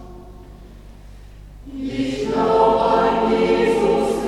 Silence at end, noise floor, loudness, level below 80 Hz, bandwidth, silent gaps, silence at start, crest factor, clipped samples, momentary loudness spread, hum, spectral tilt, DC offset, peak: 0 s; -40 dBFS; -18 LUFS; -40 dBFS; 12.5 kHz; none; 0 s; 16 dB; under 0.1%; 11 LU; 50 Hz at -40 dBFS; -6 dB/octave; under 0.1%; -4 dBFS